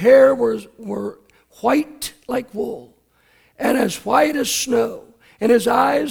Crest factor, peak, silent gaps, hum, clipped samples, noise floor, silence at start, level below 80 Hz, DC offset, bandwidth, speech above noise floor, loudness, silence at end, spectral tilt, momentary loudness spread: 18 dB; -2 dBFS; none; none; under 0.1%; -58 dBFS; 0 s; -54 dBFS; under 0.1%; 18.5 kHz; 40 dB; -19 LUFS; 0 s; -3.5 dB/octave; 14 LU